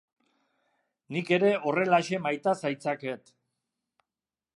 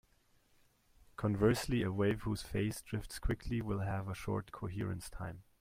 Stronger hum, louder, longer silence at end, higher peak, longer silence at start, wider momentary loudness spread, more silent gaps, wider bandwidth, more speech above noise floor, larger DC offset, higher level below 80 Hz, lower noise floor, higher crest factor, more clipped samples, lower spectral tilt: neither; first, -28 LUFS vs -37 LUFS; first, 1.4 s vs 0.2 s; first, -10 dBFS vs -18 dBFS; about the same, 1.1 s vs 1.2 s; about the same, 11 LU vs 12 LU; neither; second, 11.5 kHz vs 16 kHz; first, over 63 dB vs 35 dB; neither; second, -80 dBFS vs -50 dBFS; first, under -90 dBFS vs -71 dBFS; about the same, 20 dB vs 20 dB; neither; about the same, -5.5 dB/octave vs -6.5 dB/octave